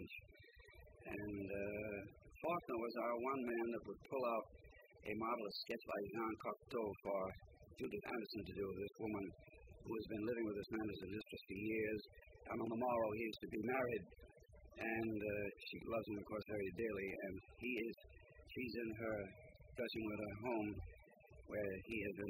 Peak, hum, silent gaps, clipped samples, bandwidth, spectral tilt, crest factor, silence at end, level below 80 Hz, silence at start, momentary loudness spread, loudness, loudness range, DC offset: -28 dBFS; none; none; under 0.1%; 16 kHz; -7 dB/octave; 18 dB; 0 s; -68 dBFS; 0 s; 18 LU; -46 LUFS; 3 LU; under 0.1%